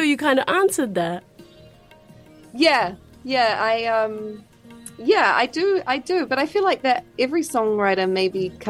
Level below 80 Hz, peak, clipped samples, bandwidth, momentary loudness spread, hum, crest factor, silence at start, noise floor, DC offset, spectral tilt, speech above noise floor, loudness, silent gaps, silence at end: -60 dBFS; -4 dBFS; under 0.1%; 16 kHz; 15 LU; none; 18 dB; 0 s; -48 dBFS; under 0.1%; -4 dB/octave; 28 dB; -20 LUFS; none; 0 s